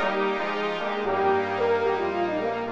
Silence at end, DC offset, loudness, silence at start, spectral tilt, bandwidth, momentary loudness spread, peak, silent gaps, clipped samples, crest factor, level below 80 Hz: 0 s; under 0.1%; -25 LUFS; 0 s; -6 dB/octave; 7.6 kHz; 4 LU; -12 dBFS; none; under 0.1%; 12 dB; -60 dBFS